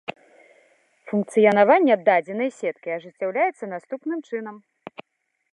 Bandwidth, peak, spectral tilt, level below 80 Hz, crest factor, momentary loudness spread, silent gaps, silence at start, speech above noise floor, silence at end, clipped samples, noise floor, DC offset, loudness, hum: 11.5 kHz; -4 dBFS; -6.5 dB/octave; -78 dBFS; 20 dB; 22 LU; none; 0.1 s; 54 dB; 0.95 s; under 0.1%; -76 dBFS; under 0.1%; -22 LUFS; none